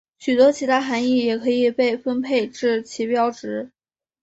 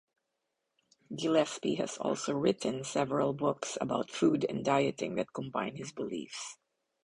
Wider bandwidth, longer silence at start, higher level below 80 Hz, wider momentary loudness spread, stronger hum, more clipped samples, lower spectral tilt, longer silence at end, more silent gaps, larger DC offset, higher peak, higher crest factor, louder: second, 8 kHz vs 11.5 kHz; second, 0.2 s vs 1.1 s; about the same, -66 dBFS vs -70 dBFS; about the same, 10 LU vs 10 LU; neither; neither; about the same, -4 dB/octave vs -5 dB/octave; about the same, 0.55 s vs 0.5 s; neither; neither; first, -4 dBFS vs -14 dBFS; about the same, 16 dB vs 20 dB; first, -20 LUFS vs -33 LUFS